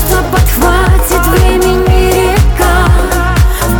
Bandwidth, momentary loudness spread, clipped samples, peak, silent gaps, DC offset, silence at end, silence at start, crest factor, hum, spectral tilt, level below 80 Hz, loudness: over 20 kHz; 2 LU; under 0.1%; 0 dBFS; none; under 0.1%; 0 s; 0 s; 8 dB; none; -5 dB/octave; -12 dBFS; -9 LUFS